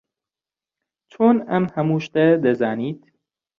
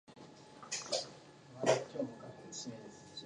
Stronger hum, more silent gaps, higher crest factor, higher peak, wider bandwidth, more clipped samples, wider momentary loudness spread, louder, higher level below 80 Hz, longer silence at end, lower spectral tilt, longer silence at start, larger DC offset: neither; neither; second, 18 dB vs 24 dB; first, -4 dBFS vs -16 dBFS; second, 6.8 kHz vs 11.5 kHz; neither; second, 11 LU vs 22 LU; first, -20 LUFS vs -39 LUFS; first, -64 dBFS vs -80 dBFS; first, 0.6 s vs 0 s; first, -8.5 dB/octave vs -3 dB/octave; first, 1.2 s vs 0.1 s; neither